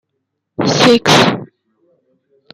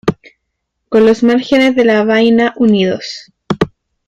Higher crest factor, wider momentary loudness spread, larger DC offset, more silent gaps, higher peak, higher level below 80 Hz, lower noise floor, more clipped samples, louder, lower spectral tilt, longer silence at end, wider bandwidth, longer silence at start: about the same, 16 dB vs 12 dB; first, 17 LU vs 12 LU; neither; neither; about the same, 0 dBFS vs 0 dBFS; second, -52 dBFS vs -46 dBFS; about the same, -73 dBFS vs -72 dBFS; neither; about the same, -11 LUFS vs -12 LUFS; second, -4 dB/octave vs -6 dB/octave; first, 1.1 s vs 0.4 s; first, 16 kHz vs 9 kHz; first, 0.6 s vs 0.05 s